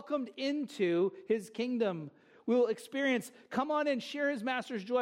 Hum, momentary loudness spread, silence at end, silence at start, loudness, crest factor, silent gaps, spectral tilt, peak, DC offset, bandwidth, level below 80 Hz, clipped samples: none; 6 LU; 0 s; 0 s; -33 LUFS; 16 dB; none; -5 dB/octave; -18 dBFS; under 0.1%; 16 kHz; -82 dBFS; under 0.1%